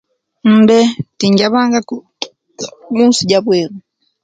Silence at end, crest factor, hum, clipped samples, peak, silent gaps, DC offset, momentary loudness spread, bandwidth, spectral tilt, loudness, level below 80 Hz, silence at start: 0.45 s; 14 dB; none; under 0.1%; 0 dBFS; none; under 0.1%; 18 LU; 9.2 kHz; -5 dB/octave; -12 LUFS; -56 dBFS; 0.45 s